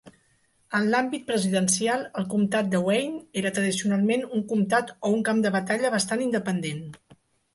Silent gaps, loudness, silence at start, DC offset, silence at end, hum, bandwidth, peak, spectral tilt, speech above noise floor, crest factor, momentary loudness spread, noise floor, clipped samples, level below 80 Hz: none; -25 LUFS; 0.05 s; under 0.1%; 0.6 s; none; 12 kHz; -10 dBFS; -4.5 dB/octave; 41 dB; 16 dB; 6 LU; -66 dBFS; under 0.1%; -68 dBFS